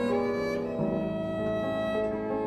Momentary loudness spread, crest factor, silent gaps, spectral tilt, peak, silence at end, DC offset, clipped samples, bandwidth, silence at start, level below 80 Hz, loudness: 3 LU; 12 dB; none; -7.5 dB/octave; -16 dBFS; 0 s; under 0.1%; under 0.1%; 13 kHz; 0 s; -52 dBFS; -30 LUFS